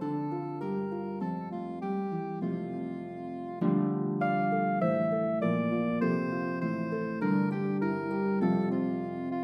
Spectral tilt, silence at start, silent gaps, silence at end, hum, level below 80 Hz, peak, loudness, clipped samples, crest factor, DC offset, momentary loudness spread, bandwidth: -10 dB/octave; 0 s; none; 0 s; none; -76 dBFS; -14 dBFS; -31 LUFS; under 0.1%; 16 dB; under 0.1%; 8 LU; 5.6 kHz